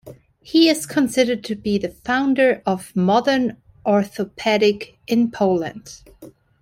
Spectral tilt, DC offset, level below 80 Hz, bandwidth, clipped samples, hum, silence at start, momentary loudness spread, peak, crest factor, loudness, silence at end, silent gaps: -5 dB/octave; under 0.1%; -56 dBFS; 16.5 kHz; under 0.1%; none; 0.05 s; 9 LU; -4 dBFS; 16 dB; -19 LUFS; 0.35 s; none